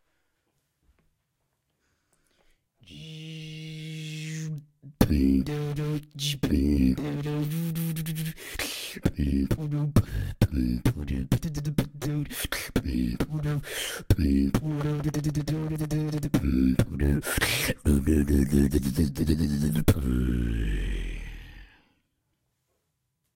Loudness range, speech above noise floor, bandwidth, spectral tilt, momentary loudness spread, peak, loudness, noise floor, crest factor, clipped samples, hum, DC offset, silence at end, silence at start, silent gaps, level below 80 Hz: 8 LU; 52 dB; 17 kHz; -6 dB/octave; 12 LU; -4 dBFS; -27 LUFS; -78 dBFS; 22 dB; under 0.1%; none; under 0.1%; 1.7 s; 2.9 s; none; -34 dBFS